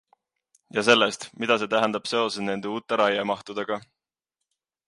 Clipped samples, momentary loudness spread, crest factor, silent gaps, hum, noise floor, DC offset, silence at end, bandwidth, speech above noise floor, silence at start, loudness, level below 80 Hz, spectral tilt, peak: under 0.1%; 11 LU; 22 dB; none; none; -85 dBFS; under 0.1%; 1.05 s; 11.5 kHz; 61 dB; 0.75 s; -24 LUFS; -72 dBFS; -3.5 dB/octave; -4 dBFS